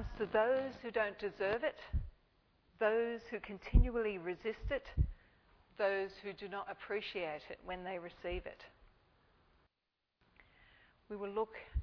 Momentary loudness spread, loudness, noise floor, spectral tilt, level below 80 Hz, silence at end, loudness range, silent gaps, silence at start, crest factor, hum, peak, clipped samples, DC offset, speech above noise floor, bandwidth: 12 LU; -39 LUFS; -87 dBFS; -5 dB/octave; -44 dBFS; 0 s; 11 LU; none; 0 s; 24 dB; none; -14 dBFS; under 0.1%; under 0.1%; 50 dB; 5.4 kHz